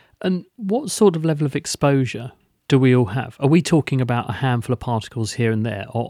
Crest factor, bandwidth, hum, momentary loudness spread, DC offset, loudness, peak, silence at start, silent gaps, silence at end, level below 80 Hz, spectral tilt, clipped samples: 16 dB; 15 kHz; none; 8 LU; under 0.1%; -20 LUFS; -4 dBFS; 0.2 s; none; 0 s; -52 dBFS; -6.5 dB/octave; under 0.1%